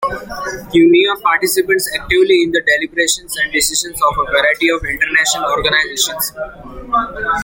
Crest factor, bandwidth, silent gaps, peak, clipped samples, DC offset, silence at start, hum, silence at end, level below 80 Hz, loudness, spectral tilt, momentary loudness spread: 14 dB; 17 kHz; none; 0 dBFS; under 0.1%; under 0.1%; 0 s; none; 0 s; -38 dBFS; -14 LUFS; -2 dB/octave; 9 LU